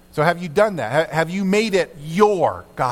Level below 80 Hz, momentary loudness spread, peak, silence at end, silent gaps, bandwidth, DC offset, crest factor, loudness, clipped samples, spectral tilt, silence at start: -52 dBFS; 5 LU; 0 dBFS; 0 s; none; 16 kHz; under 0.1%; 18 dB; -19 LUFS; under 0.1%; -5.5 dB/octave; 0.15 s